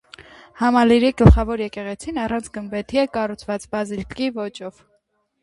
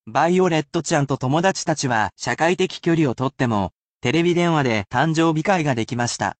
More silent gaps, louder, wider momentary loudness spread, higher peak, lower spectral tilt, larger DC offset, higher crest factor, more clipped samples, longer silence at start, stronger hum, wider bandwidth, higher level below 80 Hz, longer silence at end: second, none vs 3.72-4.00 s; about the same, -20 LUFS vs -20 LUFS; first, 15 LU vs 4 LU; first, 0 dBFS vs -4 dBFS; first, -7 dB/octave vs -5 dB/octave; neither; about the same, 20 dB vs 16 dB; neither; first, 0.2 s vs 0.05 s; neither; first, 11.5 kHz vs 9 kHz; first, -28 dBFS vs -54 dBFS; first, 0.75 s vs 0.1 s